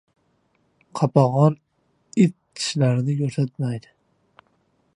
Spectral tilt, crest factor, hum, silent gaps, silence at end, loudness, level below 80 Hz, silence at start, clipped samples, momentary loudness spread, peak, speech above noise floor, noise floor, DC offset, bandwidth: -7 dB/octave; 22 dB; none; none; 1.15 s; -21 LUFS; -66 dBFS; 0.95 s; under 0.1%; 11 LU; -2 dBFS; 46 dB; -66 dBFS; under 0.1%; 11 kHz